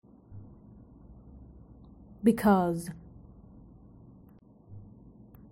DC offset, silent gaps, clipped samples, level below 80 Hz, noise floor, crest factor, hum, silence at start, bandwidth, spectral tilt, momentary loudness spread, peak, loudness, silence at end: under 0.1%; none; under 0.1%; -56 dBFS; -56 dBFS; 22 dB; none; 0.3 s; 16 kHz; -7.5 dB/octave; 29 LU; -12 dBFS; -27 LUFS; 0.7 s